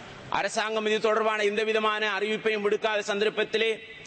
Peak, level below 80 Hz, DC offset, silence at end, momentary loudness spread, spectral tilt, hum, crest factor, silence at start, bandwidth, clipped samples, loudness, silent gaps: -12 dBFS; -66 dBFS; under 0.1%; 0 s; 3 LU; -3 dB/octave; none; 16 dB; 0 s; 8.8 kHz; under 0.1%; -26 LUFS; none